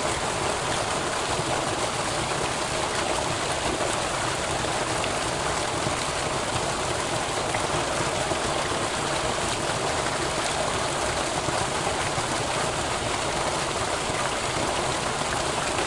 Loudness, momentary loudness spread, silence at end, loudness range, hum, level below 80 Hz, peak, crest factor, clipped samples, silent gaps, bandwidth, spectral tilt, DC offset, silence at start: -26 LUFS; 1 LU; 0 s; 0 LU; none; -44 dBFS; -10 dBFS; 18 dB; under 0.1%; none; 11.5 kHz; -3 dB/octave; under 0.1%; 0 s